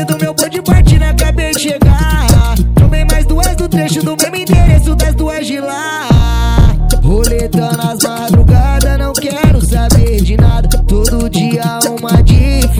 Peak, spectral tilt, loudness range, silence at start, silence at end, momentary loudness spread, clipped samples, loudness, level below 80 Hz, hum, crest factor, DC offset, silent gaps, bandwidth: 0 dBFS; -5.5 dB/octave; 2 LU; 0 s; 0 s; 6 LU; 2%; -11 LUFS; -12 dBFS; none; 8 dB; under 0.1%; none; 17.5 kHz